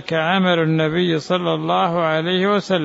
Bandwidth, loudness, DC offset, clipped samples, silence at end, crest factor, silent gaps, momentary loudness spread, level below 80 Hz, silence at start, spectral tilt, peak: 8 kHz; -18 LUFS; under 0.1%; under 0.1%; 0 s; 12 dB; none; 3 LU; -58 dBFS; 0 s; -6.5 dB/octave; -6 dBFS